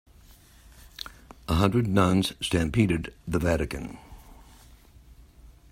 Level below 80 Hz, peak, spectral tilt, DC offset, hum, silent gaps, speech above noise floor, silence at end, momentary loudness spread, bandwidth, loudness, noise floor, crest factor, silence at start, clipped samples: -44 dBFS; -6 dBFS; -6 dB/octave; under 0.1%; none; none; 29 dB; 0.25 s; 19 LU; 16 kHz; -26 LUFS; -53 dBFS; 22 dB; 1 s; under 0.1%